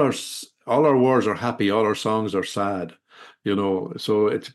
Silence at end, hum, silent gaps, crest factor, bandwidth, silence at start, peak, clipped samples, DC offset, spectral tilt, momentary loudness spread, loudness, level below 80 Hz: 0.05 s; none; none; 16 dB; 12.5 kHz; 0 s; -6 dBFS; under 0.1%; under 0.1%; -5.5 dB/octave; 13 LU; -22 LUFS; -68 dBFS